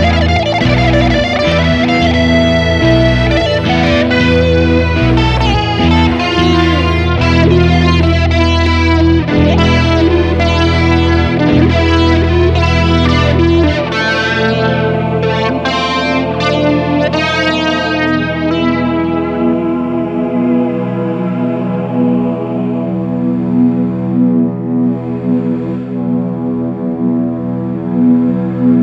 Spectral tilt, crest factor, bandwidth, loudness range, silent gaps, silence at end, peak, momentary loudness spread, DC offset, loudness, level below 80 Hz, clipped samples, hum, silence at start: -7 dB/octave; 10 dB; 8.2 kHz; 5 LU; none; 0 s; 0 dBFS; 6 LU; under 0.1%; -12 LUFS; -22 dBFS; under 0.1%; none; 0 s